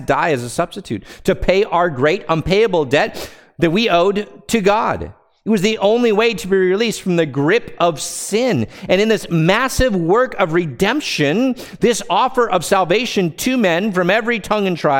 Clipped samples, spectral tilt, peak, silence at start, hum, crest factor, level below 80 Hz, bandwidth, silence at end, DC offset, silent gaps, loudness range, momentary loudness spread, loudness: under 0.1%; -5 dB/octave; 0 dBFS; 0 s; none; 16 dB; -38 dBFS; 17 kHz; 0 s; under 0.1%; none; 1 LU; 6 LU; -16 LUFS